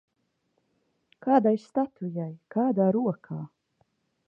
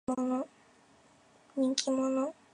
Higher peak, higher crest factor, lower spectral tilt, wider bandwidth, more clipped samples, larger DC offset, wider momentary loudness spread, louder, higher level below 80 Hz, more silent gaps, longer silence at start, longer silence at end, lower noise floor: about the same, -8 dBFS vs -8 dBFS; second, 20 dB vs 26 dB; first, -10 dB/octave vs -3 dB/octave; second, 7.4 kHz vs 11 kHz; neither; neither; first, 15 LU vs 10 LU; first, -27 LUFS vs -32 LUFS; about the same, -76 dBFS vs -76 dBFS; neither; first, 1.25 s vs 0.1 s; first, 0.8 s vs 0.2 s; first, -76 dBFS vs -63 dBFS